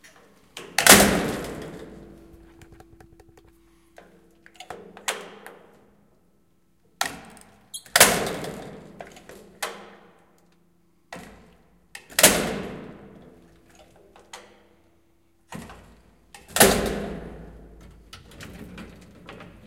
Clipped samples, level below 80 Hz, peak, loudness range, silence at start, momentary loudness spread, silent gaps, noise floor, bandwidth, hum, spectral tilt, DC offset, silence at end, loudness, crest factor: under 0.1%; -48 dBFS; 0 dBFS; 18 LU; 0.55 s; 28 LU; none; -65 dBFS; 16.5 kHz; none; -2 dB/octave; under 0.1%; 0.25 s; -20 LUFS; 28 dB